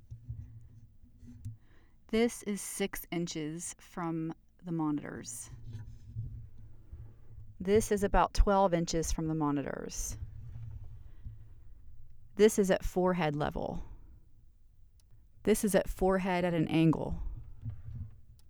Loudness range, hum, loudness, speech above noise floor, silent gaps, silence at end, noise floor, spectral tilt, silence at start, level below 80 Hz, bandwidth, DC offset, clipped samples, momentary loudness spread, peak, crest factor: 8 LU; none; -32 LUFS; 28 dB; none; 0 s; -58 dBFS; -5.5 dB/octave; 0.1 s; -42 dBFS; over 20 kHz; under 0.1%; under 0.1%; 21 LU; -12 dBFS; 22 dB